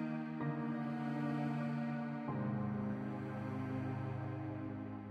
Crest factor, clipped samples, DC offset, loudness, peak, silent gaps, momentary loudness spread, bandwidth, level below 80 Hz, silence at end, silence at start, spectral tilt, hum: 12 dB; under 0.1%; under 0.1%; -41 LUFS; -28 dBFS; none; 5 LU; 8.2 kHz; -70 dBFS; 0 s; 0 s; -9.5 dB/octave; none